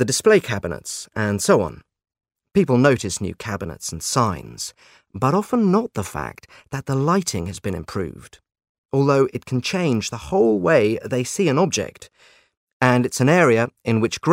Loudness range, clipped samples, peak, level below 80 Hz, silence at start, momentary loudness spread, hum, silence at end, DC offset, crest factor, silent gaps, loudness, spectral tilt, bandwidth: 4 LU; under 0.1%; 0 dBFS; -50 dBFS; 0 s; 13 LU; none; 0 s; under 0.1%; 20 dB; 8.69-8.89 s, 12.57-12.67 s, 12.73-12.80 s; -20 LUFS; -5 dB/octave; 16 kHz